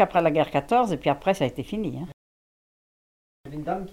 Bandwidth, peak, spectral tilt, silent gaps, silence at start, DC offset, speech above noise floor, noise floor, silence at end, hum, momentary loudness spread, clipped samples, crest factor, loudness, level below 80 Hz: 15.5 kHz; -6 dBFS; -6.5 dB/octave; 2.13-3.44 s; 0 s; under 0.1%; over 66 dB; under -90 dBFS; 0 s; none; 15 LU; under 0.1%; 18 dB; -25 LUFS; -52 dBFS